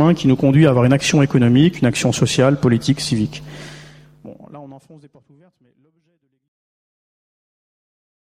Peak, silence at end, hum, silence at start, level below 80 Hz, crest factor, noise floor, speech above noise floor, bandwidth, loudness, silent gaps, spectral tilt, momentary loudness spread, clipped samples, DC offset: -2 dBFS; 3.6 s; none; 0 s; -48 dBFS; 16 dB; -42 dBFS; 26 dB; 14.5 kHz; -15 LUFS; none; -6 dB/octave; 15 LU; under 0.1%; under 0.1%